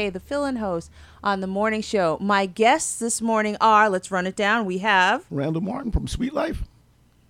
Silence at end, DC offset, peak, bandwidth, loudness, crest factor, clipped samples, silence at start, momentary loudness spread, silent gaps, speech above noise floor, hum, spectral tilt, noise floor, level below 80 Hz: 0.65 s; under 0.1%; -6 dBFS; 16 kHz; -22 LUFS; 18 dB; under 0.1%; 0 s; 10 LU; none; 35 dB; none; -4 dB/octave; -57 dBFS; -40 dBFS